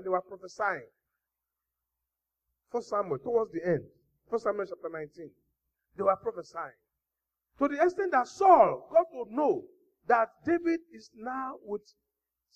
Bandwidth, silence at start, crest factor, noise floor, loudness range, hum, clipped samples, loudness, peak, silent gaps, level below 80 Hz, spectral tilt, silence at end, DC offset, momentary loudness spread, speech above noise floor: 8.4 kHz; 0 s; 22 dB; -88 dBFS; 9 LU; none; under 0.1%; -29 LUFS; -8 dBFS; none; -72 dBFS; -6.5 dB/octave; 0.75 s; under 0.1%; 16 LU; 59 dB